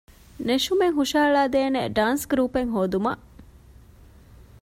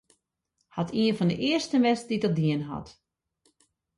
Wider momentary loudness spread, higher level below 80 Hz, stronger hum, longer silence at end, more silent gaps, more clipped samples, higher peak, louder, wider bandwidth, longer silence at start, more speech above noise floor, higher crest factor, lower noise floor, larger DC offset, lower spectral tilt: second, 6 LU vs 12 LU; first, -50 dBFS vs -62 dBFS; neither; first, 1.2 s vs 1.05 s; neither; neither; about the same, -8 dBFS vs -10 dBFS; first, -23 LUFS vs -26 LUFS; first, 16 kHz vs 11.5 kHz; second, 0.35 s vs 0.75 s; second, 27 dB vs 52 dB; about the same, 16 dB vs 18 dB; second, -49 dBFS vs -78 dBFS; neither; second, -4.5 dB/octave vs -6 dB/octave